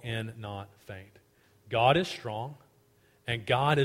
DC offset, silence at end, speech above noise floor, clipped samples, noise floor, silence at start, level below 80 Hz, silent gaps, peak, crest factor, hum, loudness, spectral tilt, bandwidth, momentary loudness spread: under 0.1%; 0 s; 35 dB; under 0.1%; -65 dBFS; 0.05 s; -60 dBFS; none; -8 dBFS; 22 dB; none; -30 LUFS; -6 dB/octave; 16 kHz; 21 LU